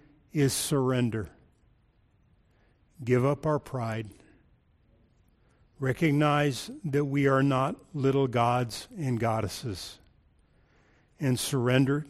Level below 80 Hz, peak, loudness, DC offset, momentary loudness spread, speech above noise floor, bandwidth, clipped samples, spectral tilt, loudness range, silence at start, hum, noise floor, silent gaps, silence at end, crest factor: -58 dBFS; -10 dBFS; -28 LUFS; under 0.1%; 12 LU; 38 dB; 15 kHz; under 0.1%; -6 dB/octave; 6 LU; 0.35 s; none; -65 dBFS; none; 0 s; 18 dB